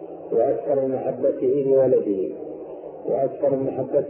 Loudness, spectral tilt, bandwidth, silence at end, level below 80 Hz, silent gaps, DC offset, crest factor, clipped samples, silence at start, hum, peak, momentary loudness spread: -22 LUFS; -13 dB/octave; 3.1 kHz; 0 s; -64 dBFS; none; under 0.1%; 14 dB; under 0.1%; 0 s; none; -8 dBFS; 15 LU